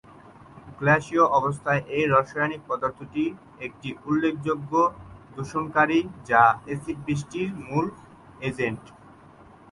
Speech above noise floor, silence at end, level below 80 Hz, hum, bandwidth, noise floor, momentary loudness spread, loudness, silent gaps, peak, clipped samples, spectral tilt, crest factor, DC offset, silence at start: 26 dB; 0.85 s; -56 dBFS; none; 11.5 kHz; -50 dBFS; 13 LU; -24 LUFS; none; -4 dBFS; under 0.1%; -6.5 dB/octave; 20 dB; under 0.1%; 0.55 s